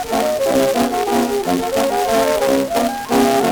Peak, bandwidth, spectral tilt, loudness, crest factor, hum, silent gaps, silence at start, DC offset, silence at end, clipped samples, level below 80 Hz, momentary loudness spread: -2 dBFS; over 20 kHz; -4 dB/octave; -17 LUFS; 14 dB; none; none; 0 s; under 0.1%; 0 s; under 0.1%; -44 dBFS; 3 LU